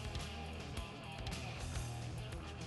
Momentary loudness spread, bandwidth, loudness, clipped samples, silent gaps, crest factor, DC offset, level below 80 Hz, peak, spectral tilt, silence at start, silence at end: 3 LU; 12 kHz; -45 LUFS; under 0.1%; none; 16 dB; under 0.1%; -50 dBFS; -28 dBFS; -4.5 dB/octave; 0 s; 0 s